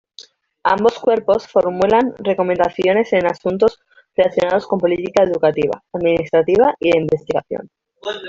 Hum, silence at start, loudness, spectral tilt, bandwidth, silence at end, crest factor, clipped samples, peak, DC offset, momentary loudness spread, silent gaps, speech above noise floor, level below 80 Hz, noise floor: none; 0.65 s; -17 LUFS; -6.5 dB/octave; 7.6 kHz; 0 s; 16 dB; under 0.1%; -2 dBFS; under 0.1%; 7 LU; none; 28 dB; -52 dBFS; -44 dBFS